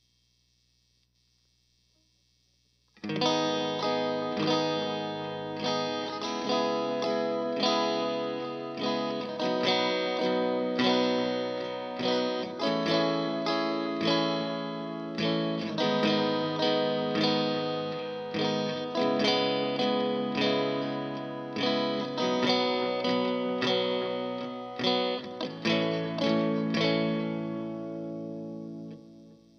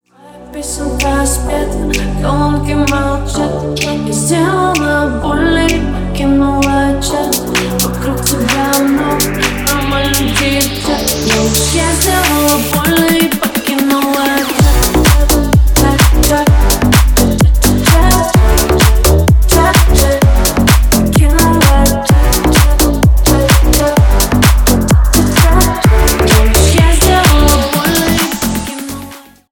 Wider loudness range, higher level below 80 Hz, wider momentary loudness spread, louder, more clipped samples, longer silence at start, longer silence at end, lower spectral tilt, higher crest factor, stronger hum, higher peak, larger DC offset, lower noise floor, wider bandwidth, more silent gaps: about the same, 2 LU vs 4 LU; second, -74 dBFS vs -14 dBFS; about the same, 9 LU vs 7 LU; second, -29 LUFS vs -11 LUFS; neither; first, 3.05 s vs 0.35 s; about the same, 0.2 s vs 0.3 s; about the same, -5 dB/octave vs -4.5 dB/octave; first, 18 dB vs 10 dB; first, 60 Hz at -70 dBFS vs none; second, -10 dBFS vs 0 dBFS; neither; first, -70 dBFS vs -35 dBFS; second, 7 kHz vs 19.5 kHz; neither